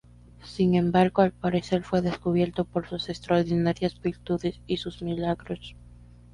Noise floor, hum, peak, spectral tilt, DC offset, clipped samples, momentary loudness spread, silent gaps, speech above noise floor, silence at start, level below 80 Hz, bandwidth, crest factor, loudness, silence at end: -49 dBFS; 60 Hz at -45 dBFS; -6 dBFS; -7.5 dB/octave; under 0.1%; under 0.1%; 11 LU; none; 24 dB; 0.4 s; -50 dBFS; 11 kHz; 20 dB; -26 LUFS; 0.3 s